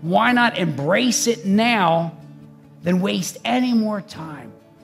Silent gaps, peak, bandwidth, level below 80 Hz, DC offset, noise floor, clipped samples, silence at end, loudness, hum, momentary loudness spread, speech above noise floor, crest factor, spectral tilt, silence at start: none; -2 dBFS; 15.5 kHz; -66 dBFS; under 0.1%; -44 dBFS; under 0.1%; 0.3 s; -19 LUFS; none; 14 LU; 25 dB; 18 dB; -4.5 dB/octave; 0 s